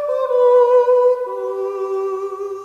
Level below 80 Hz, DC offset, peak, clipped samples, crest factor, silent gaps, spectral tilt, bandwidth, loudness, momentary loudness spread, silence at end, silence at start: -66 dBFS; under 0.1%; -4 dBFS; under 0.1%; 12 dB; none; -4.5 dB/octave; 6.6 kHz; -17 LUFS; 11 LU; 0 s; 0 s